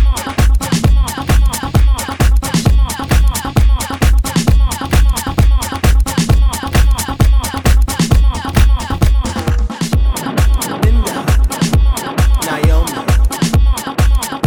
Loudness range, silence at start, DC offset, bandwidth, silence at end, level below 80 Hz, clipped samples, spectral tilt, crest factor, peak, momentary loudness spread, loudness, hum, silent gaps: 1 LU; 0 s; 0.4%; 18.5 kHz; 0 s; -12 dBFS; under 0.1%; -5 dB/octave; 12 dB; 0 dBFS; 2 LU; -14 LUFS; none; none